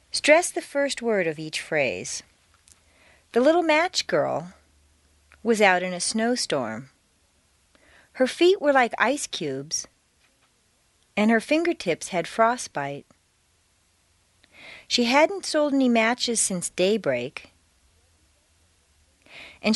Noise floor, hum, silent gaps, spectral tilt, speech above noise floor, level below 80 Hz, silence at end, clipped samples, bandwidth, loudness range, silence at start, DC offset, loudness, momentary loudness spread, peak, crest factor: -65 dBFS; none; none; -3 dB/octave; 42 dB; -66 dBFS; 0 s; under 0.1%; 11.5 kHz; 4 LU; 0.15 s; under 0.1%; -23 LUFS; 14 LU; -4 dBFS; 22 dB